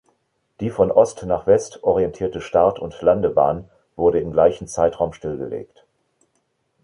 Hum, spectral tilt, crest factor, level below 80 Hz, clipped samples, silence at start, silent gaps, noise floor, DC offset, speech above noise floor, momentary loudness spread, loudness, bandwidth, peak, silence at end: none; -6.5 dB/octave; 18 dB; -46 dBFS; under 0.1%; 0.6 s; none; -69 dBFS; under 0.1%; 50 dB; 12 LU; -20 LUFS; 11 kHz; -2 dBFS; 1.2 s